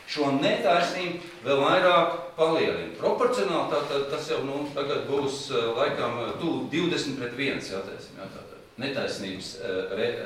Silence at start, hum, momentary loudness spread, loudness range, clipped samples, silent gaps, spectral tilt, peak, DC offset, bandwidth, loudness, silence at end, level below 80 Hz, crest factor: 0 s; none; 12 LU; 7 LU; under 0.1%; none; -4.5 dB/octave; -8 dBFS; under 0.1%; 15.5 kHz; -27 LUFS; 0 s; -62 dBFS; 18 dB